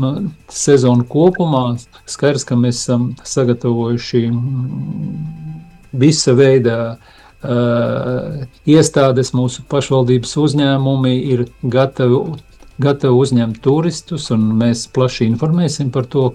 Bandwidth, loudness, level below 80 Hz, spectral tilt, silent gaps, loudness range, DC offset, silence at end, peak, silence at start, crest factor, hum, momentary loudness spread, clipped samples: 11.5 kHz; -15 LUFS; -46 dBFS; -6 dB/octave; none; 3 LU; under 0.1%; 0 s; 0 dBFS; 0 s; 14 dB; none; 12 LU; under 0.1%